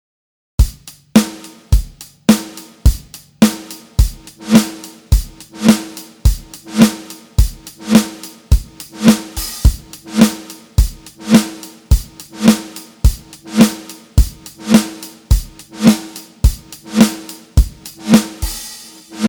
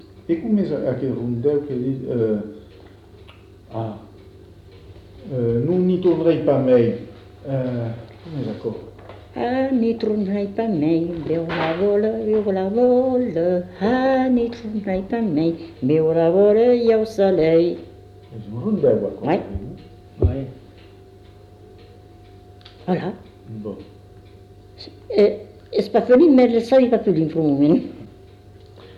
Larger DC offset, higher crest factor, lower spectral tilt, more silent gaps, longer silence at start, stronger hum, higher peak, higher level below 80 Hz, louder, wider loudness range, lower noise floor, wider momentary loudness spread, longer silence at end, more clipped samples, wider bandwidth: neither; about the same, 16 dB vs 16 dB; second, -5.5 dB/octave vs -9 dB/octave; neither; first, 0.6 s vs 0.3 s; neither; first, 0 dBFS vs -6 dBFS; first, -20 dBFS vs -44 dBFS; first, -16 LUFS vs -19 LUFS; second, 1 LU vs 13 LU; second, -35 dBFS vs -45 dBFS; about the same, 18 LU vs 18 LU; about the same, 0 s vs 0.05 s; first, 0.3% vs under 0.1%; first, over 20 kHz vs 7 kHz